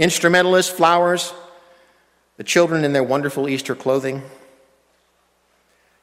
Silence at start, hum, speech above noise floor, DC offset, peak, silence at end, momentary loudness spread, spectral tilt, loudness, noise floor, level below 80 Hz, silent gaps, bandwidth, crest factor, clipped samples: 0 s; none; 45 dB; under 0.1%; -2 dBFS; 1.75 s; 14 LU; -4 dB/octave; -18 LUFS; -62 dBFS; -64 dBFS; none; 16 kHz; 18 dB; under 0.1%